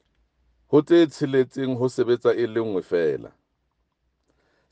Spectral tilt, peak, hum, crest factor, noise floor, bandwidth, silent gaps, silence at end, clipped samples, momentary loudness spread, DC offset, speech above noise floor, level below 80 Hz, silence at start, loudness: -7 dB/octave; -6 dBFS; none; 18 dB; -73 dBFS; 9 kHz; none; 1.45 s; under 0.1%; 8 LU; under 0.1%; 52 dB; -66 dBFS; 0.7 s; -22 LUFS